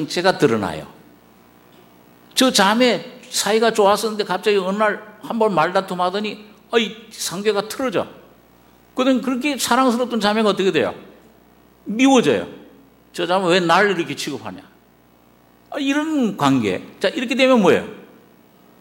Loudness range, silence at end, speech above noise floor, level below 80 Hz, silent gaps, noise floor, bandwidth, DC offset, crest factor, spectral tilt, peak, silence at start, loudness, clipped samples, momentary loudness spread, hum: 4 LU; 0.75 s; 35 dB; -60 dBFS; none; -53 dBFS; 16.5 kHz; under 0.1%; 20 dB; -4 dB/octave; 0 dBFS; 0 s; -18 LUFS; under 0.1%; 14 LU; none